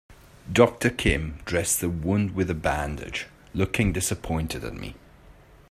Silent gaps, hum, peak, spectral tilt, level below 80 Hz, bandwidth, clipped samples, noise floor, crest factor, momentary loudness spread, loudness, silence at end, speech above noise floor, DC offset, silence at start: none; none; -2 dBFS; -4.5 dB/octave; -40 dBFS; 16 kHz; under 0.1%; -51 dBFS; 24 dB; 13 LU; -25 LUFS; 0.4 s; 26 dB; under 0.1%; 0.1 s